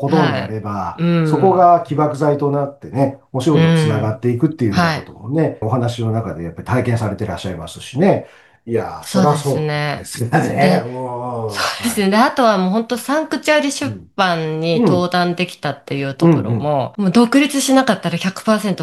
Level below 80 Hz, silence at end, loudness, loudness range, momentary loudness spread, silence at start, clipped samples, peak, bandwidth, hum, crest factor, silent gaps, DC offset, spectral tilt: -52 dBFS; 0 s; -17 LUFS; 4 LU; 10 LU; 0 s; under 0.1%; -2 dBFS; 12.5 kHz; none; 16 dB; none; 0.1%; -6 dB/octave